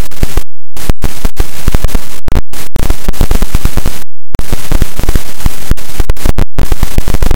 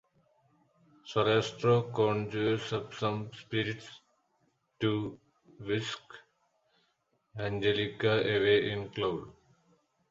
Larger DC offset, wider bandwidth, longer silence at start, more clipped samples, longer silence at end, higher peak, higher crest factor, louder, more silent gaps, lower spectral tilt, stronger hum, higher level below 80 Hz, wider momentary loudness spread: neither; first, 17 kHz vs 7.8 kHz; second, 0 s vs 1.05 s; first, 40% vs under 0.1%; second, 0 s vs 0.8 s; first, 0 dBFS vs -14 dBFS; second, 2 dB vs 18 dB; first, -18 LUFS vs -31 LUFS; neither; about the same, -5 dB/octave vs -6 dB/octave; neither; first, -12 dBFS vs -64 dBFS; second, 5 LU vs 13 LU